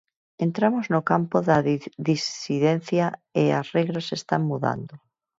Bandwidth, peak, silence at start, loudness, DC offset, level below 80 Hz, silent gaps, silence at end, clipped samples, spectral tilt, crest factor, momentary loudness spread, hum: 7.8 kHz; -4 dBFS; 0.4 s; -24 LUFS; under 0.1%; -64 dBFS; none; 0.4 s; under 0.1%; -6.5 dB/octave; 20 dB; 6 LU; none